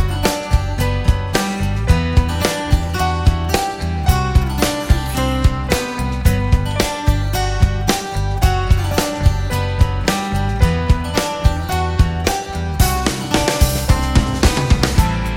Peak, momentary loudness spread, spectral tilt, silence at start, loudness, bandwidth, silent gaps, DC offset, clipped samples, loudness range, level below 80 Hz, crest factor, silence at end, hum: 0 dBFS; 4 LU; -5 dB/octave; 0 s; -17 LUFS; 17 kHz; none; under 0.1%; under 0.1%; 1 LU; -20 dBFS; 16 dB; 0 s; none